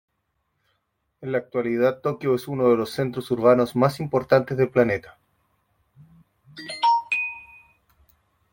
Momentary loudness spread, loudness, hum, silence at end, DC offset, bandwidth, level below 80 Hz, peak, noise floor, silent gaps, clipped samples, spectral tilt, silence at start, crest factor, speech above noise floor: 11 LU; -22 LUFS; none; 1.1 s; under 0.1%; 16.5 kHz; -62 dBFS; -4 dBFS; -74 dBFS; none; under 0.1%; -7 dB/octave; 1.2 s; 20 dB; 53 dB